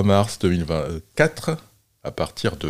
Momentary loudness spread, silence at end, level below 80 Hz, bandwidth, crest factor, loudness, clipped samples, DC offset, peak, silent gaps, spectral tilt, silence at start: 13 LU; 0 s; -46 dBFS; 16 kHz; 20 dB; -23 LUFS; under 0.1%; under 0.1%; -2 dBFS; none; -6 dB/octave; 0 s